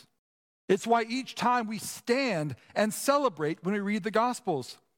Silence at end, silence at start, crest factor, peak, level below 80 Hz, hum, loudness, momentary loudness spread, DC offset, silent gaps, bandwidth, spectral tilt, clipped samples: 0.25 s; 0.7 s; 18 dB; -10 dBFS; -78 dBFS; none; -29 LUFS; 7 LU; under 0.1%; none; 17.5 kHz; -4.5 dB/octave; under 0.1%